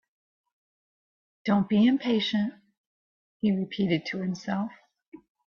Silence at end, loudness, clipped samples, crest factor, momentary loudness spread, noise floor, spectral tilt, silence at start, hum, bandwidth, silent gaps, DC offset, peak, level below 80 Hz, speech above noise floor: 0.3 s; -27 LUFS; under 0.1%; 16 dB; 10 LU; under -90 dBFS; -7 dB/octave; 1.45 s; none; 6.8 kHz; 2.77-3.40 s, 5.08-5.12 s; under 0.1%; -12 dBFS; -68 dBFS; over 64 dB